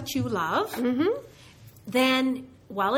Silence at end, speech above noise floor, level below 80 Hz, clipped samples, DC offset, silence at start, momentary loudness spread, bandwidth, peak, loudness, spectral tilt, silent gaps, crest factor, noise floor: 0 s; 25 dB; -60 dBFS; under 0.1%; under 0.1%; 0 s; 13 LU; 17 kHz; -10 dBFS; -26 LUFS; -4.5 dB/octave; none; 16 dB; -50 dBFS